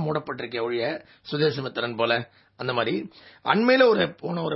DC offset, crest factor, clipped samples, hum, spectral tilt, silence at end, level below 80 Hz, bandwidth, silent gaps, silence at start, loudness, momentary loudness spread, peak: under 0.1%; 22 dB; under 0.1%; none; -9 dB/octave; 0 s; -66 dBFS; 5.8 kHz; none; 0 s; -24 LUFS; 15 LU; -4 dBFS